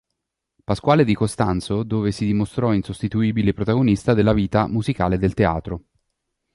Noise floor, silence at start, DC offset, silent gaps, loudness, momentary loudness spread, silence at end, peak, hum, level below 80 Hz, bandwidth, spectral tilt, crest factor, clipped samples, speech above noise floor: -79 dBFS; 0.7 s; under 0.1%; none; -20 LUFS; 7 LU; 0.75 s; -2 dBFS; none; -40 dBFS; 11.5 kHz; -7.5 dB/octave; 18 dB; under 0.1%; 60 dB